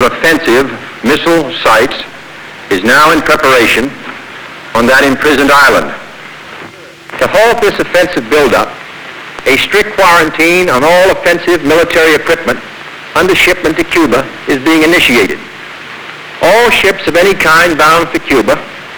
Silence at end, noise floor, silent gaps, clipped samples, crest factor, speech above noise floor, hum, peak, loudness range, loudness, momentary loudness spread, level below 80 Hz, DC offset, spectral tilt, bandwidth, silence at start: 0 s; -30 dBFS; none; 0.7%; 10 dB; 22 dB; none; 0 dBFS; 3 LU; -8 LUFS; 19 LU; -36 dBFS; under 0.1%; -3.5 dB/octave; over 20 kHz; 0 s